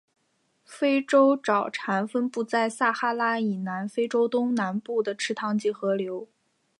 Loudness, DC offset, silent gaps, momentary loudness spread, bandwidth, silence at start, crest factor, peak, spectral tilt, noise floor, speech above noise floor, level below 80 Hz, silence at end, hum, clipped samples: -26 LUFS; under 0.1%; none; 8 LU; 11.5 kHz; 0.7 s; 18 dB; -8 dBFS; -5 dB/octave; -71 dBFS; 46 dB; -82 dBFS; 0.55 s; none; under 0.1%